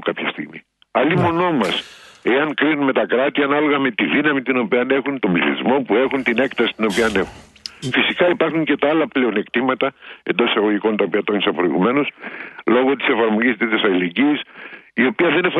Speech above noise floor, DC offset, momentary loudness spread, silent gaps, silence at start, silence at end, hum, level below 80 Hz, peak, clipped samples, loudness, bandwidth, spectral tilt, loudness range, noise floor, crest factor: 23 dB; under 0.1%; 9 LU; none; 0 s; 0 s; none; -56 dBFS; -2 dBFS; under 0.1%; -18 LUFS; 12 kHz; -6 dB/octave; 1 LU; -41 dBFS; 18 dB